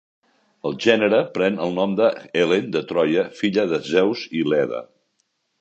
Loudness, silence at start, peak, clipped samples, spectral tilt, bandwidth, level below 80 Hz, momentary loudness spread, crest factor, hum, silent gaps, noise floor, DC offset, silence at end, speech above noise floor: -21 LUFS; 0.65 s; 0 dBFS; under 0.1%; -6 dB/octave; 8.2 kHz; -64 dBFS; 6 LU; 20 dB; none; none; -71 dBFS; under 0.1%; 0.75 s; 51 dB